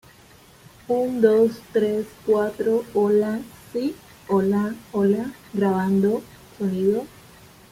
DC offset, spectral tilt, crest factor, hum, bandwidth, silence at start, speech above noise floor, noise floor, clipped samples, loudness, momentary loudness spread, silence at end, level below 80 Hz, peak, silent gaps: under 0.1%; -7.5 dB/octave; 18 dB; none; 16 kHz; 0.9 s; 29 dB; -50 dBFS; under 0.1%; -22 LUFS; 10 LU; 0.65 s; -60 dBFS; -4 dBFS; none